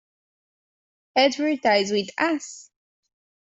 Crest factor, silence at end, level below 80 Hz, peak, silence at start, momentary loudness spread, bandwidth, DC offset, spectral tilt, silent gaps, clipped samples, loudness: 18 dB; 0.95 s; -70 dBFS; -6 dBFS; 1.15 s; 12 LU; 8.2 kHz; under 0.1%; -3.5 dB/octave; none; under 0.1%; -22 LUFS